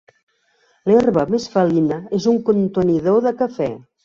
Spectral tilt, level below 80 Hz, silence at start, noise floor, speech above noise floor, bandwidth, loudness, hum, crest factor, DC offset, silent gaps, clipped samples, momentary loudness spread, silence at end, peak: -7.5 dB/octave; -54 dBFS; 0.85 s; -61 dBFS; 44 dB; 7.4 kHz; -18 LUFS; none; 14 dB; under 0.1%; none; under 0.1%; 7 LU; 0.25 s; -4 dBFS